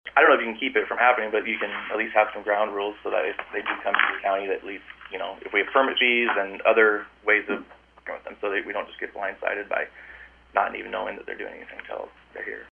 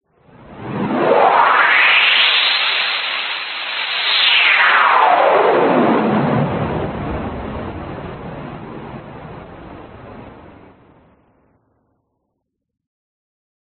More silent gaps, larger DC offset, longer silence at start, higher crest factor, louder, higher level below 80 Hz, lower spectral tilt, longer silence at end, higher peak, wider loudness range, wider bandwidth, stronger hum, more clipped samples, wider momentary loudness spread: neither; neither; second, 0.05 s vs 0.45 s; first, 24 dB vs 18 dB; second, -24 LUFS vs -13 LUFS; second, -62 dBFS vs -44 dBFS; first, -5.5 dB/octave vs -1 dB/octave; second, 0.05 s vs 3.25 s; about the same, -2 dBFS vs 0 dBFS; second, 8 LU vs 20 LU; about the same, 4.5 kHz vs 4.6 kHz; neither; neither; second, 17 LU vs 22 LU